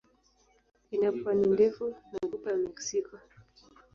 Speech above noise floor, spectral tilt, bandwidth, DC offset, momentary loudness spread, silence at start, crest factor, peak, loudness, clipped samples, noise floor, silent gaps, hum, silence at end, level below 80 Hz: 38 dB; -5 dB/octave; 7.2 kHz; under 0.1%; 12 LU; 0.9 s; 18 dB; -14 dBFS; -30 LUFS; under 0.1%; -67 dBFS; none; none; 0.75 s; -66 dBFS